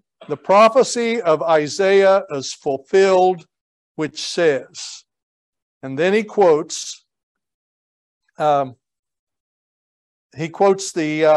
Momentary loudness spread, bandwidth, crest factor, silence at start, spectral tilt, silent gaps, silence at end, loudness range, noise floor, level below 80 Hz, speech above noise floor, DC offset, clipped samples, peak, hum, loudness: 16 LU; 11.5 kHz; 16 dB; 0.2 s; -4 dB/octave; 3.61-3.95 s, 5.23-5.53 s, 5.62-5.81 s, 7.23-7.35 s, 7.54-8.21 s, 8.99-9.03 s, 9.19-9.27 s, 9.40-10.30 s; 0 s; 10 LU; under -90 dBFS; -70 dBFS; over 73 dB; under 0.1%; under 0.1%; -2 dBFS; none; -17 LUFS